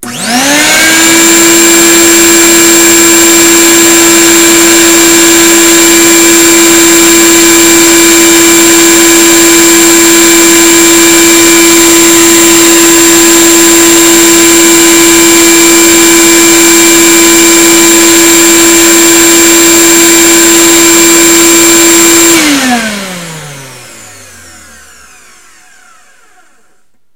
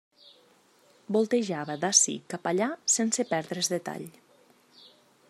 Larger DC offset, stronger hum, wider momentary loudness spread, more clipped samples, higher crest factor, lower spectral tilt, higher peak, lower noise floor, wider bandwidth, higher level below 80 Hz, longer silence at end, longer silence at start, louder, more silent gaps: first, 3% vs under 0.1%; neither; second, 0 LU vs 12 LU; first, 20% vs under 0.1%; second, 4 dB vs 26 dB; second, -1 dB/octave vs -2.5 dB/octave; first, 0 dBFS vs -4 dBFS; second, -54 dBFS vs -62 dBFS; first, over 20 kHz vs 14.5 kHz; first, -36 dBFS vs -80 dBFS; first, 3.05 s vs 1.2 s; second, 0 s vs 1.1 s; first, -1 LUFS vs -26 LUFS; neither